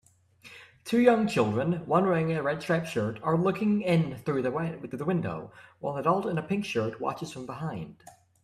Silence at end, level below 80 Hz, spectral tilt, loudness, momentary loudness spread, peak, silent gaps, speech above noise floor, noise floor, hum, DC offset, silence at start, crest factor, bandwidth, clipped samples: 0.5 s; -64 dBFS; -7 dB/octave; -28 LUFS; 14 LU; -8 dBFS; none; 28 dB; -55 dBFS; none; under 0.1%; 0.45 s; 20 dB; 13.5 kHz; under 0.1%